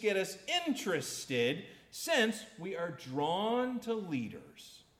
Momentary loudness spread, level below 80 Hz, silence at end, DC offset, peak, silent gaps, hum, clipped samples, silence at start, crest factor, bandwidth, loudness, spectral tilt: 13 LU; -74 dBFS; 0.2 s; under 0.1%; -18 dBFS; none; none; under 0.1%; 0 s; 18 dB; 17 kHz; -35 LUFS; -3.5 dB/octave